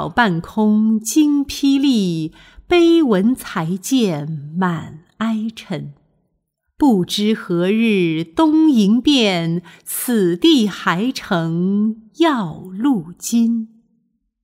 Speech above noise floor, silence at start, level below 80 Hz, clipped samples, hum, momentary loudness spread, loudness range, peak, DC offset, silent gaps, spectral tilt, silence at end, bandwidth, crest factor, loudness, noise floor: 54 dB; 0 s; -50 dBFS; under 0.1%; none; 12 LU; 6 LU; -2 dBFS; under 0.1%; none; -5 dB/octave; 0.75 s; 16 kHz; 16 dB; -17 LUFS; -70 dBFS